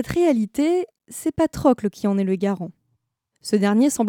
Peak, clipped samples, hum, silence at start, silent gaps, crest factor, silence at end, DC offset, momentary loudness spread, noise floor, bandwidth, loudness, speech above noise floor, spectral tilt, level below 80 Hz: -4 dBFS; under 0.1%; none; 0 s; none; 18 dB; 0 s; under 0.1%; 11 LU; -72 dBFS; 17.5 kHz; -21 LUFS; 52 dB; -6 dB/octave; -50 dBFS